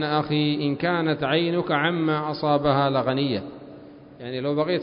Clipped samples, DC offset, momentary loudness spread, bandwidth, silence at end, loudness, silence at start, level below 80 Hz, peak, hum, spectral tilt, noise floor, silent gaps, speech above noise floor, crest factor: under 0.1%; under 0.1%; 12 LU; 5.4 kHz; 0 s; -23 LUFS; 0 s; -56 dBFS; -6 dBFS; none; -11 dB/octave; -44 dBFS; none; 21 dB; 16 dB